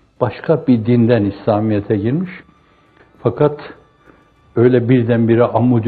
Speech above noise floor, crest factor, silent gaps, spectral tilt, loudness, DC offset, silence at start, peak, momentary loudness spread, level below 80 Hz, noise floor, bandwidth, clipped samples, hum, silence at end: 37 dB; 16 dB; none; -11.5 dB/octave; -15 LUFS; under 0.1%; 0.2 s; 0 dBFS; 9 LU; -52 dBFS; -51 dBFS; 4.7 kHz; under 0.1%; none; 0 s